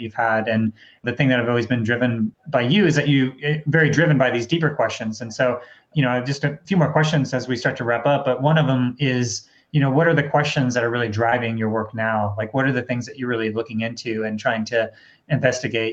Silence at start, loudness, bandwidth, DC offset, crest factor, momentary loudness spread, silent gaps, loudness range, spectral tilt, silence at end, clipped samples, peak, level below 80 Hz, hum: 0 s; -21 LUFS; 8 kHz; under 0.1%; 18 dB; 9 LU; none; 4 LU; -6 dB/octave; 0 s; under 0.1%; -2 dBFS; -58 dBFS; none